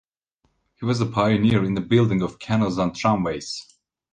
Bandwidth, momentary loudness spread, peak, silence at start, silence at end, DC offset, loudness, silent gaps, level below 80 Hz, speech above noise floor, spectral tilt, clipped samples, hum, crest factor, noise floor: 9.6 kHz; 11 LU; -6 dBFS; 0.8 s; 0.5 s; under 0.1%; -22 LUFS; none; -50 dBFS; 49 dB; -6.5 dB/octave; under 0.1%; none; 18 dB; -70 dBFS